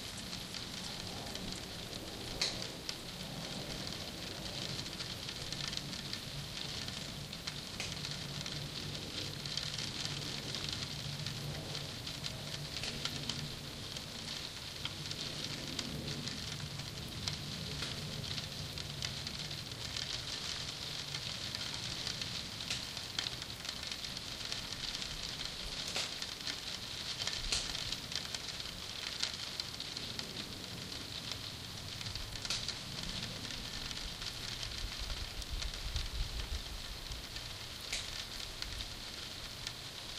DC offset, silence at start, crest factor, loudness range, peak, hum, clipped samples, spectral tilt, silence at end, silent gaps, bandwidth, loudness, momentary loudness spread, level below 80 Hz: under 0.1%; 0 s; 26 dB; 3 LU; -16 dBFS; none; under 0.1%; -2.5 dB/octave; 0 s; none; 16 kHz; -40 LUFS; 5 LU; -52 dBFS